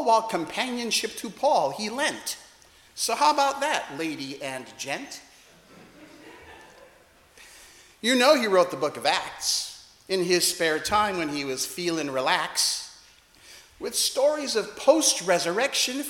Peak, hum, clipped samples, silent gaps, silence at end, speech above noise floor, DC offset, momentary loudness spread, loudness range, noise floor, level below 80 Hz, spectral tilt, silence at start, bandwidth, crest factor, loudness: -4 dBFS; none; under 0.1%; none; 0 s; 31 dB; under 0.1%; 13 LU; 11 LU; -56 dBFS; -64 dBFS; -2 dB/octave; 0 s; 18 kHz; 22 dB; -24 LUFS